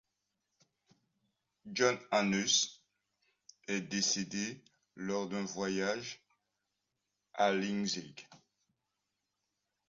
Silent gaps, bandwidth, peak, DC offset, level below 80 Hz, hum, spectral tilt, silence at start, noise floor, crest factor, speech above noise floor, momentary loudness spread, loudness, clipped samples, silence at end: none; 7.4 kHz; -14 dBFS; under 0.1%; -76 dBFS; none; -2.5 dB/octave; 1.65 s; -86 dBFS; 24 dB; 52 dB; 19 LU; -34 LUFS; under 0.1%; 1.5 s